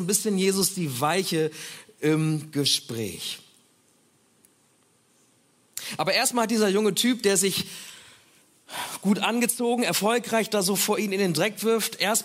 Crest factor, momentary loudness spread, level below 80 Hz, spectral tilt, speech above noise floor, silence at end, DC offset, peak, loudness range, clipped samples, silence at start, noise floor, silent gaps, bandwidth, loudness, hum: 18 dB; 12 LU; -72 dBFS; -3.5 dB/octave; 39 dB; 0 s; under 0.1%; -8 dBFS; 7 LU; under 0.1%; 0 s; -63 dBFS; none; 16 kHz; -24 LUFS; none